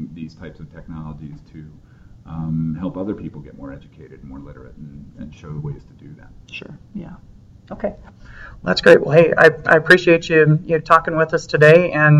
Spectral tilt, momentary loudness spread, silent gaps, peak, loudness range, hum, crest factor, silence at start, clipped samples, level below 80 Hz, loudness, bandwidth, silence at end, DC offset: -7 dB/octave; 26 LU; none; 0 dBFS; 22 LU; none; 18 dB; 0 s; under 0.1%; -44 dBFS; -14 LUFS; 11 kHz; 0 s; under 0.1%